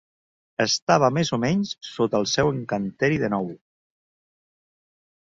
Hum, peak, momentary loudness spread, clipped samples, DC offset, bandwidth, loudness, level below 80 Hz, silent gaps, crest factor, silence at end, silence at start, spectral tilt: none; -2 dBFS; 9 LU; under 0.1%; under 0.1%; 7.8 kHz; -23 LUFS; -56 dBFS; 0.82-0.87 s; 22 dB; 1.85 s; 0.6 s; -4.5 dB/octave